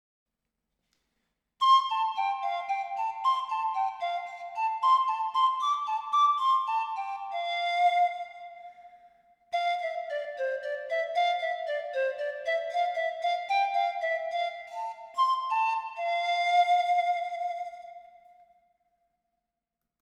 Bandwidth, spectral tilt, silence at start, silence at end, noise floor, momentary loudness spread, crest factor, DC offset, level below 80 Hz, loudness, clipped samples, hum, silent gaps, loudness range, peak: 10.5 kHz; 1.5 dB/octave; 1.6 s; 2 s; -87 dBFS; 11 LU; 16 dB; under 0.1%; -82 dBFS; -28 LUFS; under 0.1%; none; none; 4 LU; -14 dBFS